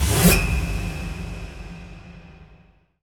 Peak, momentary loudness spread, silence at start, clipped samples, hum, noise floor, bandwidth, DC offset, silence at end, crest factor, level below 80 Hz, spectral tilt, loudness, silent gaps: -2 dBFS; 25 LU; 0 s; under 0.1%; none; -54 dBFS; over 20 kHz; under 0.1%; 0.6 s; 22 dB; -30 dBFS; -4.5 dB/octave; -22 LUFS; none